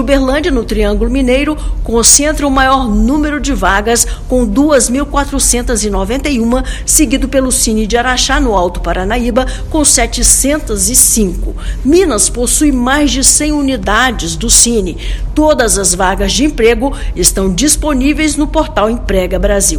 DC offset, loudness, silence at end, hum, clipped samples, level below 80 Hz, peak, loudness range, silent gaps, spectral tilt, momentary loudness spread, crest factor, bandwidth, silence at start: under 0.1%; -10 LUFS; 0 s; none; 0.7%; -18 dBFS; 0 dBFS; 2 LU; none; -3 dB/octave; 8 LU; 10 dB; over 20 kHz; 0 s